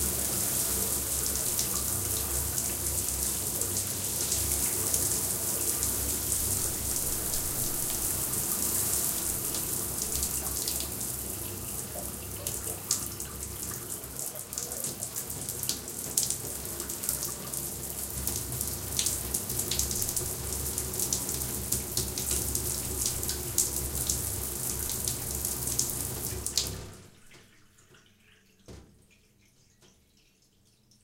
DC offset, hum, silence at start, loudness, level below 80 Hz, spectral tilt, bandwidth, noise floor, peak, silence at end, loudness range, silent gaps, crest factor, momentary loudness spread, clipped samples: under 0.1%; none; 0 s; -29 LUFS; -46 dBFS; -2 dB/octave; 17 kHz; -65 dBFS; -4 dBFS; 1.15 s; 6 LU; none; 30 dB; 8 LU; under 0.1%